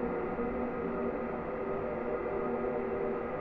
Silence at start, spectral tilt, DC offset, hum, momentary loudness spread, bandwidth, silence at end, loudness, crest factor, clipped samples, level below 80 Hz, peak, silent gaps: 0 s; -10 dB/octave; under 0.1%; none; 2 LU; 4.9 kHz; 0 s; -35 LUFS; 12 dB; under 0.1%; -52 dBFS; -22 dBFS; none